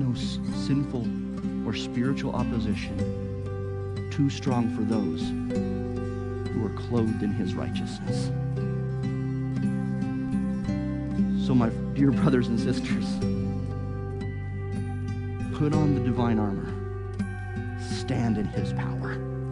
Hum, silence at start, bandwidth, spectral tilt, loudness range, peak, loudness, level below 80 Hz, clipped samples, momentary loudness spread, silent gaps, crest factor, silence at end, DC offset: none; 0 s; 10.5 kHz; -7.5 dB/octave; 3 LU; -10 dBFS; -28 LUFS; -42 dBFS; under 0.1%; 9 LU; none; 16 dB; 0 s; under 0.1%